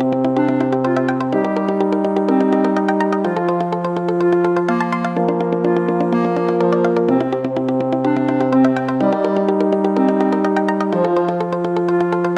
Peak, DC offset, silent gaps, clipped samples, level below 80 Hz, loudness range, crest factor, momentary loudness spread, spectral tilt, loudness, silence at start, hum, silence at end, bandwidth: -2 dBFS; under 0.1%; none; under 0.1%; -60 dBFS; 1 LU; 14 dB; 3 LU; -8.5 dB/octave; -17 LUFS; 0 s; none; 0 s; 8.8 kHz